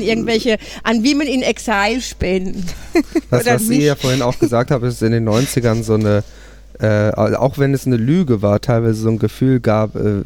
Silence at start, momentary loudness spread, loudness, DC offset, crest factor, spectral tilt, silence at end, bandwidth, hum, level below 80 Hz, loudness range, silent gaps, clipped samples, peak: 0 s; 5 LU; -16 LUFS; under 0.1%; 14 dB; -6 dB/octave; 0 s; 18 kHz; none; -36 dBFS; 1 LU; none; under 0.1%; -2 dBFS